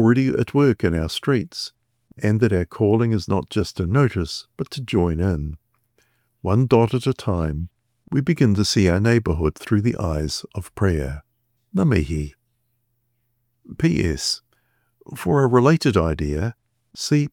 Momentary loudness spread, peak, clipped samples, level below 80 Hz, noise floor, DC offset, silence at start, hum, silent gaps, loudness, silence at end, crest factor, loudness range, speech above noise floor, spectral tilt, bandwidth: 13 LU; -4 dBFS; under 0.1%; -40 dBFS; -71 dBFS; under 0.1%; 0 s; none; none; -21 LUFS; 0.05 s; 18 dB; 5 LU; 51 dB; -6.5 dB/octave; 16.5 kHz